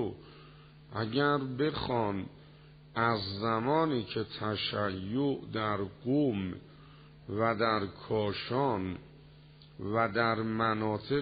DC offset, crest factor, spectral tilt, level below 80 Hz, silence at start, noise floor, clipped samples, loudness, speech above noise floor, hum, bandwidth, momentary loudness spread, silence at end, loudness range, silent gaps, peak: under 0.1%; 18 dB; -4.5 dB/octave; -60 dBFS; 0 s; -55 dBFS; under 0.1%; -32 LUFS; 24 dB; none; 4.9 kHz; 11 LU; 0 s; 2 LU; none; -14 dBFS